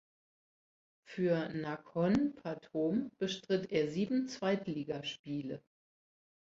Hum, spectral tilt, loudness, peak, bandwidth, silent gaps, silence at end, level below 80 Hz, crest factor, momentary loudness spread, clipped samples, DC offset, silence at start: none; -6.5 dB/octave; -36 LUFS; -20 dBFS; 7.8 kHz; 5.19-5.24 s; 1 s; -70 dBFS; 18 dB; 9 LU; under 0.1%; under 0.1%; 1.1 s